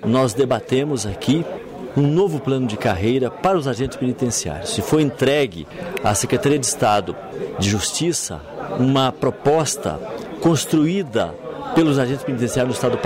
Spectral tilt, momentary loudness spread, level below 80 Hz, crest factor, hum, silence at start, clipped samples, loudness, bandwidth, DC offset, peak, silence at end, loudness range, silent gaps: -5 dB/octave; 10 LU; -46 dBFS; 12 dB; none; 0 s; under 0.1%; -20 LUFS; 16 kHz; under 0.1%; -8 dBFS; 0 s; 1 LU; none